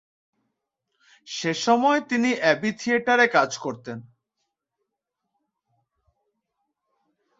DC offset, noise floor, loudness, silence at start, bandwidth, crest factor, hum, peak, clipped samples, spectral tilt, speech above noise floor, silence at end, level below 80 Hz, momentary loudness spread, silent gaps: under 0.1%; -82 dBFS; -22 LUFS; 1.25 s; 8 kHz; 22 dB; none; -4 dBFS; under 0.1%; -4 dB/octave; 60 dB; 3.4 s; -72 dBFS; 17 LU; none